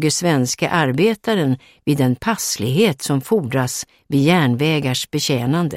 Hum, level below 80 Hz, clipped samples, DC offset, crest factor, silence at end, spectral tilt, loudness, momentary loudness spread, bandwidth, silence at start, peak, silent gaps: none; -52 dBFS; under 0.1%; under 0.1%; 16 dB; 0 s; -5 dB/octave; -18 LUFS; 6 LU; 16.5 kHz; 0 s; -2 dBFS; none